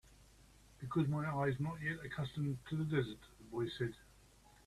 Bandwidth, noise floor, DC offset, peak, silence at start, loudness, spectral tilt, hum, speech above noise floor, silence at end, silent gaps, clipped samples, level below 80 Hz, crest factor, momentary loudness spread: 13 kHz; -65 dBFS; under 0.1%; -24 dBFS; 0.1 s; -40 LUFS; -7.5 dB/octave; none; 26 dB; 0.55 s; none; under 0.1%; -64 dBFS; 18 dB; 10 LU